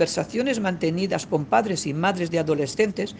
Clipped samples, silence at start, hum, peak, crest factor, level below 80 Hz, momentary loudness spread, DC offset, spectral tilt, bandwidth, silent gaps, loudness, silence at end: under 0.1%; 0 s; none; -6 dBFS; 18 dB; -58 dBFS; 3 LU; under 0.1%; -5 dB/octave; 10 kHz; none; -24 LUFS; 0 s